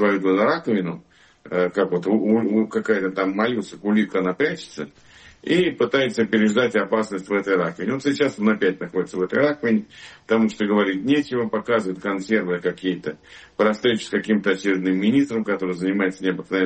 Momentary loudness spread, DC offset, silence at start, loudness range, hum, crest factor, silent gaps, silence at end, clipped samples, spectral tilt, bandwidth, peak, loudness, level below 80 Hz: 7 LU; under 0.1%; 0 s; 2 LU; none; 14 dB; none; 0 s; under 0.1%; -6 dB/octave; 8.8 kHz; -6 dBFS; -21 LUFS; -62 dBFS